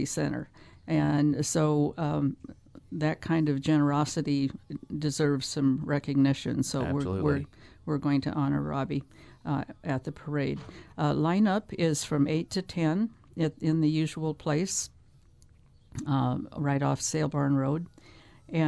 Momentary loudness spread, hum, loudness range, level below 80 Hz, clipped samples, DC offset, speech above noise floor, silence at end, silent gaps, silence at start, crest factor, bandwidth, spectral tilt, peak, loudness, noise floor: 10 LU; none; 3 LU; -56 dBFS; under 0.1%; under 0.1%; 29 dB; 0 s; none; 0 s; 16 dB; 11 kHz; -6 dB/octave; -12 dBFS; -29 LUFS; -57 dBFS